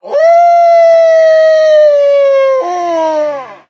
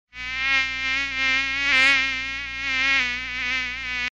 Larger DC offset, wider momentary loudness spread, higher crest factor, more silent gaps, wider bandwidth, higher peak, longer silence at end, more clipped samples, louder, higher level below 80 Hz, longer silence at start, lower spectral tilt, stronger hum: second, under 0.1% vs 0.2%; second, 7 LU vs 10 LU; second, 8 dB vs 18 dB; neither; second, 6.8 kHz vs 11.5 kHz; first, 0 dBFS vs -6 dBFS; first, 0.15 s vs 0 s; neither; first, -8 LUFS vs -21 LUFS; second, -72 dBFS vs -46 dBFS; about the same, 0.05 s vs 0.15 s; first, -2.5 dB/octave vs -1 dB/octave; second, none vs 60 Hz at -45 dBFS